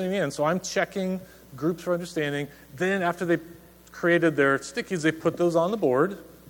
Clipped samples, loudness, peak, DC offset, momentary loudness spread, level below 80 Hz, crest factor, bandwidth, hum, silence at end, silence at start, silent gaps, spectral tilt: under 0.1%; -26 LUFS; -8 dBFS; under 0.1%; 9 LU; -60 dBFS; 18 dB; 19 kHz; none; 0 s; 0 s; none; -5.5 dB/octave